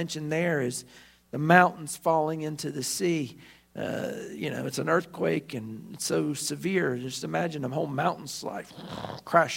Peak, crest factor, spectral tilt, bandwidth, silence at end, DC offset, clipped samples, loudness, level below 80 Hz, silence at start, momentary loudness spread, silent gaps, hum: -2 dBFS; 26 dB; -4.5 dB/octave; 16 kHz; 0 s; under 0.1%; under 0.1%; -28 LUFS; -66 dBFS; 0 s; 13 LU; none; none